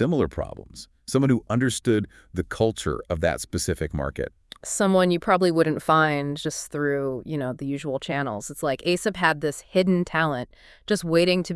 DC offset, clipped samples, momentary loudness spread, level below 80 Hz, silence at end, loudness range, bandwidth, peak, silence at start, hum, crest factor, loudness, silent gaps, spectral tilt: under 0.1%; under 0.1%; 12 LU; -48 dBFS; 0 s; 3 LU; 12 kHz; -4 dBFS; 0 s; none; 20 dB; -24 LUFS; none; -5 dB/octave